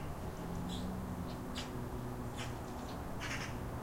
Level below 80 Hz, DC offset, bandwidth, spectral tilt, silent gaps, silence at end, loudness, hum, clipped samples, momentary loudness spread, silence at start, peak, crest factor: -50 dBFS; under 0.1%; 16 kHz; -5.5 dB/octave; none; 0 s; -43 LUFS; none; under 0.1%; 3 LU; 0 s; -26 dBFS; 14 dB